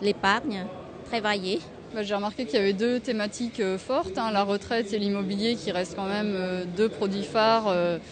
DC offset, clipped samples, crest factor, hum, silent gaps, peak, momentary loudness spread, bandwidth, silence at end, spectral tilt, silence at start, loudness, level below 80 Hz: under 0.1%; under 0.1%; 18 dB; none; none; -8 dBFS; 8 LU; 9.6 kHz; 0 s; -5 dB/octave; 0 s; -27 LUFS; -58 dBFS